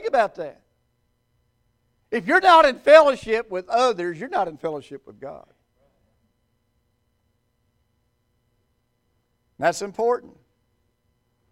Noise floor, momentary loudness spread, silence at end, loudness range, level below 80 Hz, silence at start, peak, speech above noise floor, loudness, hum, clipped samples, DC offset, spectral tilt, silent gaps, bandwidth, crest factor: -70 dBFS; 23 LU; 1.3 s; 15 LU; -60 dBFS; 0 s; 0 dBFS; 51 dB; -19 LUFS; none; under 0.1%; under 0.1%; -3.5 dB/octave; none; 12.5 kHz; 24 dB